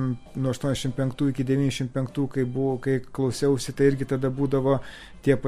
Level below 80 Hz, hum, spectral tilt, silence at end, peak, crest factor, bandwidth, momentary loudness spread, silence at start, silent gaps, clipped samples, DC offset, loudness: -48 dBFS; none; -6.5 dB/octave; 0 s; -8 dBFS; 18 dB; 14.5 kHz; 6 LU; 0 s; none; under 0.1%; under 0.1%; -26 LUFS